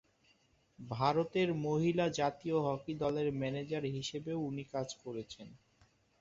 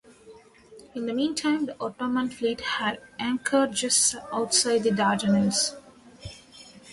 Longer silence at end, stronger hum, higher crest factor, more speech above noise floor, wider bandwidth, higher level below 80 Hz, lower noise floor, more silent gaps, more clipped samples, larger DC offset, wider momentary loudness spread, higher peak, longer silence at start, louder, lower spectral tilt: first, 0.65 s vs 0 s; neither; about the same, 20 dB vs 18 dB; first, 36 dB vs 26 dB; second, 7.8 kHz vs 11.5 kHz; second, -68 dBFS vs -60 dBFS; first, -71 dBFS vs -51 dBFS; neither; neither; neither; second, 13 LU vs 16 LU; second, -16 dBFS vs -8 dBFS; first, 0.8 s vs 0.25 s; second, -36 LUFS vs -25 LUFS; first, -5.5 dB/octave vs -3 dB/octave